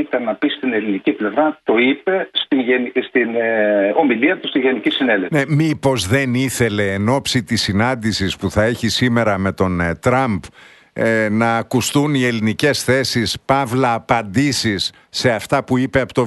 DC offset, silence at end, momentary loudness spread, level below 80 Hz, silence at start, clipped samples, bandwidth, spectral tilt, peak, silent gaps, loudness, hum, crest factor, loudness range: under 0.1%; 0 s; 4 LU; -46 dBFS; 0 s; under 0.1%; 12.5 kHz; -5 dB/octave; 0 dBFS; none; -17 LUFS; none; 16 dB; 1 LU